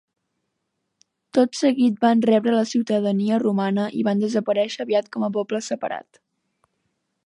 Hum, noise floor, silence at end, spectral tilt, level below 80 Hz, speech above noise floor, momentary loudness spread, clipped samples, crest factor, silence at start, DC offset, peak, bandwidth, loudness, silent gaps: none; -77 dBFS; 1.25 s; -6 dB/octave; -74 dBFS; 56 dB; 8 LU; under 0.1%; 16 dB; 1.35 s; under 0.1%; -6 dBFS; 10.5 kHz; -21 LUFS; none